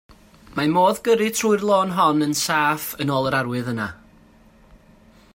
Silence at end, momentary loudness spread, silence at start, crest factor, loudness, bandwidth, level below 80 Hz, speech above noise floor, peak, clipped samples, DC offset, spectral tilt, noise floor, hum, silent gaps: 1.4 s; 8 LU; 0.5 s; 16 dB; -20 LUFS; 16.5 kHz; -56 dBFS; 31 dB; -6 dBFS; under 0.1%; under 0.1%; -4.5 dB/octave; -51 dBFS; none; none